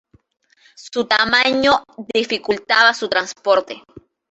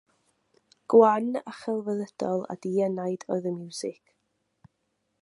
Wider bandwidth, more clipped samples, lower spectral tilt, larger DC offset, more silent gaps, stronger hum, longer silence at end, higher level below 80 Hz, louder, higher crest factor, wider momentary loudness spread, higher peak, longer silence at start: second, 8.2 kHz vs 11.5 kHz; neither; second, -2.5 dB/octave vs -6.5 dB/octave; neither; neither; neither; second, 0.3 s vs 1.3 s; first, -56 dBFS vs -78 dBFS; first, -17 LUFS vs -27 LUFS; about the same, 18 dB vs 22 dB; second, 11 LU vs 14 LU; first, 0 dBFS vs -6 dBFS; about the same, 0.8 s vs 0.9 s